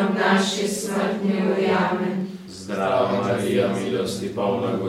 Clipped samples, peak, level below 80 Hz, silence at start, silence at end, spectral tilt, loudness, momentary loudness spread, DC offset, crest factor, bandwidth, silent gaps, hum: under 0.1%; -6 dBFS; -60 dBFS; 0 s; 0 s; -5 dB/octave; -22 LUFS; 7 LU; under 0.1%; 16 dB; 15.5 kHz; none; none